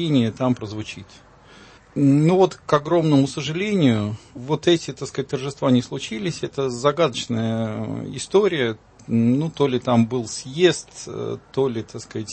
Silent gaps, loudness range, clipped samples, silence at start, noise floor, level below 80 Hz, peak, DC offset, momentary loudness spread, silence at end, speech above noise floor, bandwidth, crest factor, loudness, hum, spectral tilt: none; 3 LU; under 0.1%; 0 s; -47 dBFS; -56 dBFS; -2 dBFS; under 0.1%; 12 LU; 0 s; 26 dB; 8.8 kHz; 18 dB; -21 LUFS; none; -6 dB/octave